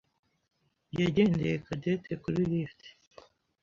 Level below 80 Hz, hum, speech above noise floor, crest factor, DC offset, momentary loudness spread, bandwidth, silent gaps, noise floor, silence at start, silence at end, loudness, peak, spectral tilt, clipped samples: -58 dBFS; none; 28 dB; 20 dB; under 0.1%; 8 LU; 7.4 kHz; none; -58 dBFS; 0.95 s; 0.7 s; -30 LUFS; -12 dBFS; -8 dB/octave; under 0.1%